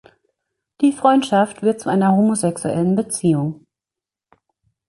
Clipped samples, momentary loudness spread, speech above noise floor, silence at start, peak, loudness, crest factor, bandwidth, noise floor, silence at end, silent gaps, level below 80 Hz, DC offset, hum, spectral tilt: under 0.1%; 6 LU; 71 dB; 0.8 s; -2 dBFS; -18 LUFS; 16 dB; 11.5 kHz; -88 dBFS; 1.35 s; none; -60 dBFS; under 0.1%; none; -6 dB/octave